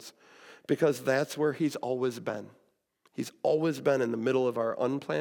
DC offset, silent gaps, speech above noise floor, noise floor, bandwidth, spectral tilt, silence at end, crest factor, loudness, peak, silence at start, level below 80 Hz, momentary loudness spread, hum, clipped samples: under 0.1%; none; 41 dB; -70 dBFS; 18 kHz; -6 dB/octave; 0 s; 18 dB; -30 LUFS; -12 dBFS; 0 s; -88 dBFS; 12 LU; none; under 0.1%